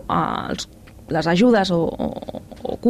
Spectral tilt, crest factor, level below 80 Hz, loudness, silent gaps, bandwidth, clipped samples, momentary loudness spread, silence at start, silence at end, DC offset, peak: -6 dB/octave; 14 dB; -44 dBFS; -20 LUFS; none; 14 kHz; under 0.1%; 17 LU; 0 s; 0 s; under 0.1%; -6 dBFS